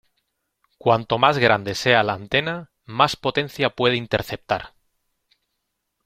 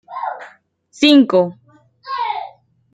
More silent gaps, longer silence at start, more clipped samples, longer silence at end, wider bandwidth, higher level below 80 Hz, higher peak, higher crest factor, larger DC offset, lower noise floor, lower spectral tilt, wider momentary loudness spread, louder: neither; first, 0.85 s vs 0.1 s; neither; first, 1.4 s vs 0.45 s; first, 16 kHz vs 8.8 kHz; first, -54 dBFS vs -64 dBFS; about the same, 0 dBFS vs -2 dBFS; first, 22 dB vs 16 dB; neither; first, -77 dBFS vs -48 dBFS; about the same, -5 dB/octave vs -5 dB/octave; second, 9 LU vs 18 LU; second, -21 LUFS vs -16 LUFS